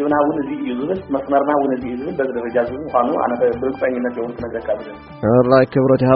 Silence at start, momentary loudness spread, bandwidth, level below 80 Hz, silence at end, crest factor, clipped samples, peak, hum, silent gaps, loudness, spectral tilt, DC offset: 0 s; 11 LU; 5.4 kHz; -48 dBFS; 0 s; 16 dB; under 0.1%; 0 dBFS; none; none; -19 LUFS; -7 dB/octave; under 0.1%